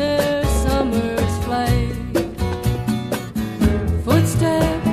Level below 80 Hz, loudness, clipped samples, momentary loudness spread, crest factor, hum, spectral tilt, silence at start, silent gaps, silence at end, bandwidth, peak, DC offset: -28 dBFS; -20 LUFS; under 0.1%; 6 LU; 16 dB; none; -6 dB/octave; 0 s; none; 0 s; 15.5 kHz; -2 dBFS; under 0.1%